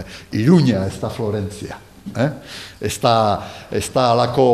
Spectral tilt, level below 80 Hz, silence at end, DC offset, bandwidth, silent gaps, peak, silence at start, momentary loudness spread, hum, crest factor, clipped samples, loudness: -6 dB/octave; -48 dBFS; 0 s; 0.1%; 14.5 kHz; none; 0 dBFS; 0 s; 18 LU; none; 18 dB; under 0.1%; -19 LUFS